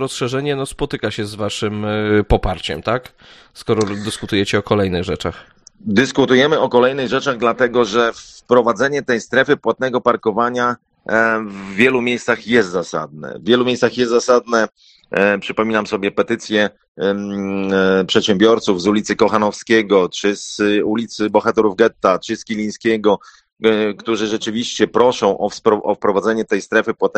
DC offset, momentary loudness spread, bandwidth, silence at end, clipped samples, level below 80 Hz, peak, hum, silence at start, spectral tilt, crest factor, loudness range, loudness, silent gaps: under 0.1%; 8 LU; 12.5 kHz; 0 s; under 0.1%; -38 dBFS; 0 dBFS; none; 0 s; -5 dB/octave; 16 dB; 4 LU; -17 LUFS; 16.88-16.95 s